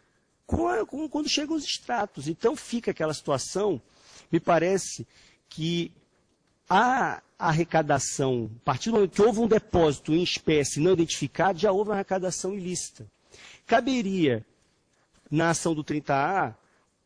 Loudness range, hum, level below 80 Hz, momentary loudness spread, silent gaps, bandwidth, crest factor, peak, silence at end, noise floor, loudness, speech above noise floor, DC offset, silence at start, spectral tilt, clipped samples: 5 LU; none; -52 dBFS; 9 LU; none; 10.5 kHz; 16 dB; -10 dBFS; 0.5 s; -69 dBFS; -26 LUFS; 43 dB; under 0.1%; 0.5 s; -4.5 dB/octave; under 0.1%